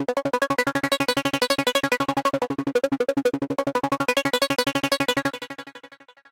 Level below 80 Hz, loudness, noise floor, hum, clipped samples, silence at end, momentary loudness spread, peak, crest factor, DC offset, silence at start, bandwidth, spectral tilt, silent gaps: -60 dBFS; -23 LUFS; -49 dBFS; none; under 0.1%; 0.45 s; 5 LU; -6 dBFS; 18 dB; under 0.1%; 0 s; 17 kHz; -3.5 dB/octave; none